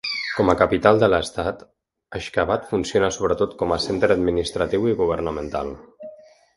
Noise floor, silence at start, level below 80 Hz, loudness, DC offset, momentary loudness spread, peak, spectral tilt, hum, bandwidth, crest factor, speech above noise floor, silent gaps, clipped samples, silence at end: -44 dBFS; 0.05 s; -42 dBFS; -21 LUFS; under 0.1%; 16 LU; 0 dBFS; -5 dB/octave; none; 11.5 kHz; 22 dB; 24 dB; none; under 0.1%; 0.4 s